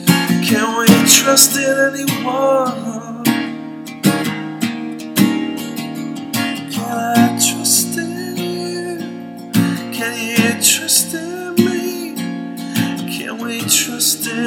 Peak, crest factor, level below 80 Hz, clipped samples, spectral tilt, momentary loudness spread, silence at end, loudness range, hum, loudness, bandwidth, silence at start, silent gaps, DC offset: 0 dBFS; 16 dB; -60 dBFS; under 0.1%; -3 dB/octave; 14 LU; 0 s; 7 LU; none; -15 LUFS; 17.5 kHz; 0 s; none; under 0.1%